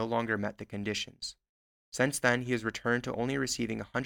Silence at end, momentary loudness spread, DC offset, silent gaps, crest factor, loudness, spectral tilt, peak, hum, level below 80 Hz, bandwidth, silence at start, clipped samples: 0 s; 10 LU; under 0.1%; 1.49-1.92 s; 22 dB; -32 LUFS; -4 dB/octave; -10 dBFS; none; -60 dBFS; 18 kHz; 0 s; under 0.1%